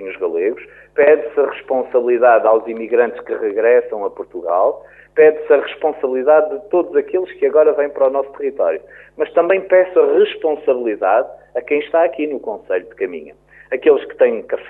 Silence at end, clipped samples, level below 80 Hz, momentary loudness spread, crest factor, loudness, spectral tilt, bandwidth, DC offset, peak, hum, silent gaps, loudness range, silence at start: 0 s; under 0.1%; -60 dBFS; 12 LU; 14 dB; -16 LUFS; -7.5 dB/octave; 3.9 kHz; under 0.1%; -2 dBFS; none; none; 3 LU; 0 s